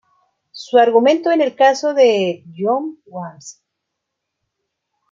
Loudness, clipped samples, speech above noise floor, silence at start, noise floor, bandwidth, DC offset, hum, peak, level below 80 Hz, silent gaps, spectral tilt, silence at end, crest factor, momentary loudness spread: -15 LUFS; under 0.1%; 63 dB; 0.55 s; -78 dBFS; 7.6 kHz; under 0.1%; none; -2 dBFS; -74 dBFS; none; -4.5 dB/octave; 1.6 s; 16 dB; 18 LU